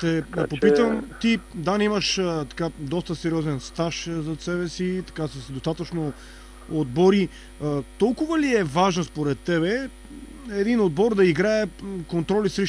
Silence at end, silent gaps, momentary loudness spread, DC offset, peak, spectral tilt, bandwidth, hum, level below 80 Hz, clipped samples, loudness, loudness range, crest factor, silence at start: 0 s; none; 12 LU; under 0.1%; -6 dBFS; -5.5 dB/octave; 11 kHz; none; -46 dBFS; under 0.1%; -24 LUFS; 5 LU; 18 dB; 0 s